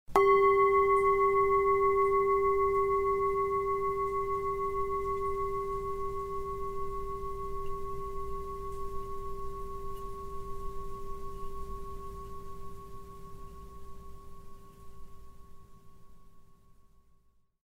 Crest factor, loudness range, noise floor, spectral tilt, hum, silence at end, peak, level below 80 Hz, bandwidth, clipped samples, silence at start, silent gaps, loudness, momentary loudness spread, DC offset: 22 dB; 22 LU; -65 dBFS; -6.5 dB/octave; none; 0.85 s; -10 dBFS; -46 dBFS; 15.5 kHz; under 0.1%; 0.1 s; none; -30 LUFS; 23 LU; under 0.1%